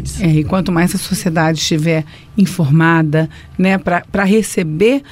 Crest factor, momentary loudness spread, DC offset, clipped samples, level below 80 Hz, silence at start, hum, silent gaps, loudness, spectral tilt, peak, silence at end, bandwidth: 12 dB; 6 LU; under 0.1%; under 0.1%; -36 dBFS; 0 s; none; none; -14 LUFS; -6 dB/octave; -2 dBFS; 0.1 s; 16 kHz